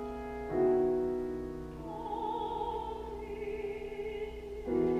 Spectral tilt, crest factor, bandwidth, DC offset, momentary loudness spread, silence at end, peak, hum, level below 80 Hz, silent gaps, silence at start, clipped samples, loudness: -8 dB/octave; 16 dB; 9 kHz; under 0.1%; 12 LU; 0 s; -20 dBFS; none; -50 dBFS; none; 0 s; under 0.1%; -36 LUFS